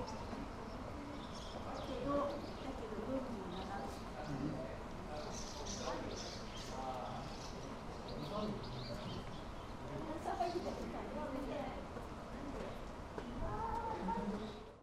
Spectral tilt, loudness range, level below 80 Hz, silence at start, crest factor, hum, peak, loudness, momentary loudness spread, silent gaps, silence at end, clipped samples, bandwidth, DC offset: -5.5 dB/octave; 2 LU; -54 dBFS; 0 s; 18 dB; none; -26 dBFS; -45 LUFS; 7 LU; none; 0 s; under 0.1%; 14.5 kHz; under 0.1%